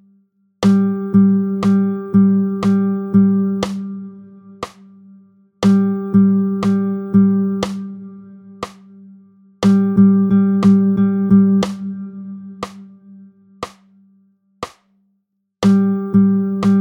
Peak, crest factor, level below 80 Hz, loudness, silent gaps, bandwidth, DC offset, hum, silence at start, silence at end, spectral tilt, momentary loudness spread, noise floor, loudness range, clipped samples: -2 dBFS; 14 dB; -54 dBFS; -15 LUFS; none; 8.4 kHz; under 0.1%; none; 0.6 s; 0 s; -8.5 dB/octave; 20 LU; -69 dBFS; 9 LU; under 0.1%